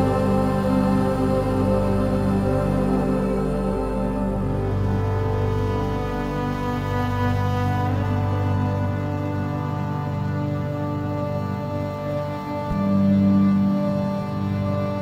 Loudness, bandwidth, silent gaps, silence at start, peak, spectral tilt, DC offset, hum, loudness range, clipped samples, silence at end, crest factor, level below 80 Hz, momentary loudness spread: -23 LUFS; 15 kHz; none; 0 s; -8 dBFS; -8.5 dB/octave; under 0.1%; none; 4 LU; under 0.1%; 0 s; 14 dB; -36 dBFS; 6 LU